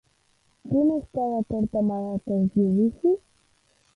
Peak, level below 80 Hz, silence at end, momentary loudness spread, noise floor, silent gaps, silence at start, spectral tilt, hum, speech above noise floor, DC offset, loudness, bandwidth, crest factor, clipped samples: -12 dBFS; -54 dBFS; 0.8 s; 6 LU; -66 dBFS; none; 0.65 s; -11 dB/octave; none; 42 dB; under 0.1%; -25 LUFS; 3.7 kHz; 14 dB; under 0.1%